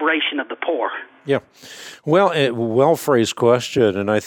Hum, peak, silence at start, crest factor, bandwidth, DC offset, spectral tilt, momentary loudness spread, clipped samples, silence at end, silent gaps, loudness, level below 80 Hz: none; -4 dBFS; 0 s; 16 dB; 18.5 kHz; under 0.1%; -5 dB/octave; 15 LU; under 0.1%; 0 s; none; -18 LUFS; -62 dBFS